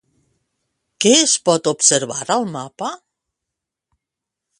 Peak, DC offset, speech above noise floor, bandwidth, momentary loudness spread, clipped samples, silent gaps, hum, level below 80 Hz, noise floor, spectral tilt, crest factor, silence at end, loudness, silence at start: 0 dBFS; under 0.1%; 67 dB; 11.5 kHz; 15 LU; under 0.1%; none; none; -66 dBFS; -84 dBFS; -2 dB/octave; 20 dB; 1.65 s; -15 LUFS; 1 s